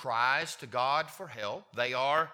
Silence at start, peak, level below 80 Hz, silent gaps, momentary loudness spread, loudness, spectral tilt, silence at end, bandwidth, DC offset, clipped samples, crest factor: 0 s; -14 dBFS; -80 dBFS; none; 10 LU; -31 LUFS; -3 dB/octave; 0 s; 19 kHz; under 0.1%; under 0.1%; 18 dB